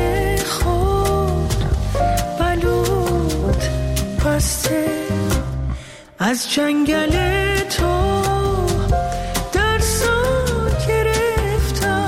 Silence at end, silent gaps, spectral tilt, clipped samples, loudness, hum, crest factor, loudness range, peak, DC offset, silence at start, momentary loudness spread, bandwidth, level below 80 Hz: 0 s; none; -5 dB/octave; under 0.1%; -19 LUFS; none; 12 dB; 2 LU; -6 dBFS; under 0.1%; 0 s; 4 LU; 16.5 kHz; -24 dBFS